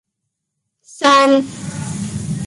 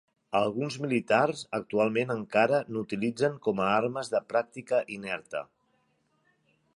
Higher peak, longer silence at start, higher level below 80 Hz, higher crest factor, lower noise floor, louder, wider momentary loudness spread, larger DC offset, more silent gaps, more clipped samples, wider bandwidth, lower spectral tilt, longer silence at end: first, -2 dBFS vs -8 dBFS; first, 0.9 s vs 0.3 s; first, -48 dBFS vs -70 dBFS; about the same, 16 dB vs 20 dB; first, -76 dBFS vs -72 dBFS; first, -15 LUFS vs -29 LUFS; first, 15 LU vs 9 LU; neither; neither; neither; about the same, 11.5 kHz vs 11.5 kHz; about the same, -4.5 dB/octave vs -5.5 dB/octave; second, 0 s vs 1.3 s